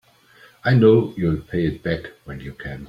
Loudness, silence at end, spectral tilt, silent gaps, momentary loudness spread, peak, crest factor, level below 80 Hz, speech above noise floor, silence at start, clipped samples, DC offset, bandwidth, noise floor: -19 LUFS; 0 s; -9 dB/octave; none; 20 LU; -2 dBFS; 18 dB; -44 dBFS; 32 dB; 0.65 s; under 0.1%; under 0.1%; 5.6 kHz; -51 dBFS